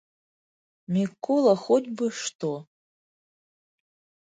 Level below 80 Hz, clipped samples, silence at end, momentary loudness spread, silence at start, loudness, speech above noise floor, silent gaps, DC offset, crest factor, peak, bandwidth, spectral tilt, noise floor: -76 dBFS; under 0.1%; 1.6 s; 11 LU; 0.9 s; -25 LUFS; over 66 dB; 2.35-2.39 s; under 0.1%; 20 dB; -8 dBFS; 9.6 kHz; -5.5 dB/octave; under -90 dBFS